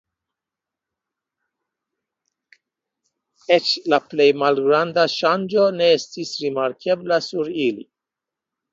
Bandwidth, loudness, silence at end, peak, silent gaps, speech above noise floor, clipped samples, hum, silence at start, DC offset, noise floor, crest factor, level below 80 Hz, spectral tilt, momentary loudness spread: 7.8 kHz; -19 LUFS; 0.9 s; -2 dBFS; none; 68 dB; under 0.1%; none; 3.5 s; under 0.1%; -87 dBFS; 20 dB; -72 dBFS; -4.5 dB/octave; 8 LU